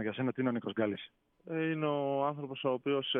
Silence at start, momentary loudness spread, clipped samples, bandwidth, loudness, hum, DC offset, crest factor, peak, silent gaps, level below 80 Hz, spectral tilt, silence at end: 0 s; 6 LU; under 0.1%; 3.9 kHz; -34 LUFS; none; under 0.1%; 16 dB; -18 dBFS; none; -82 dBFS; -9.5 dB/octave; 0 s